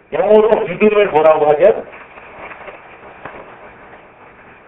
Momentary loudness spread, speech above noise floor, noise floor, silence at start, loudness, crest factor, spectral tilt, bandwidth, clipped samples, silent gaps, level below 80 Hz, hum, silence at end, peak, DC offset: 24 LU; 30 dB; -41 dBFS; 0.1 s; -12 LUFS; 16 dB; -8.5 dB/octave; 3.9 kHz; under 0.1%; none; -50 dBFS; none; 1 s; 0 dBFS; under 0.1%